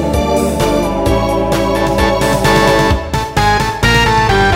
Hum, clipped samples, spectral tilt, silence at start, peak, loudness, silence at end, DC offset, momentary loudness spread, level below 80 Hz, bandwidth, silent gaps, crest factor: none; under 0.1%; -5 dB/octave; 0 s; 0 dBFS; -12 LUFS; 0 s; under 0.1%; 4 LU; -22 dBFS; 16.5 kHz; none; 12 dB